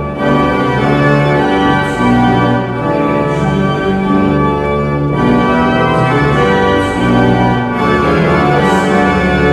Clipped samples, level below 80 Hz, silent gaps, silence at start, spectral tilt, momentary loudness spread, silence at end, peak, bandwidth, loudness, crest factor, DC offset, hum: under 0.1%; -28 dBFS; none; 0 s; -7 dB/octave; 3 LU; 0 s; 0 dBFS; 12 kHz; -11 LUFS; 10 dB; under 0.1%; none